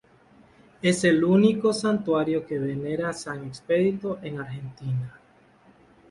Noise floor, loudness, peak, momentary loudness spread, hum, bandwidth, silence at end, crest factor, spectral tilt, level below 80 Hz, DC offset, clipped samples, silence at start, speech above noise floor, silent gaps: -57 dBFS; -25 LUFS; -8 dBFS; 15 LU; none; 11.5 kHz; 0.95 s; 18 dB; -6 dB/octave; -62 dBFS; under 0.1%; under 0.1%; 0.85 s; 33 dB; none